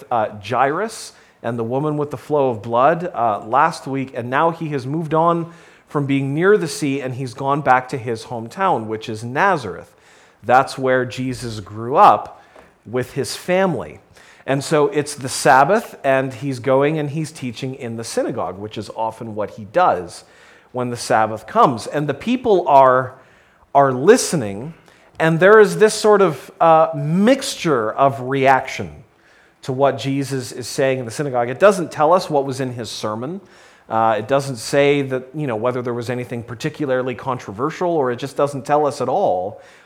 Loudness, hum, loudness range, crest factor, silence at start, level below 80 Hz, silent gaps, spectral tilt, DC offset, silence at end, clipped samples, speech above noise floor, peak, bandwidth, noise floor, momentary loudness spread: -18 LUFS; none; 7 LU; 18 dB; 0 s; -58 dBFS; none; -5.5 dB/octave; under 0.1%; 0.3 s; under 0.1%; 35 dB; 0 dBFS; 16 kHz; -52 dBFS; 14 LU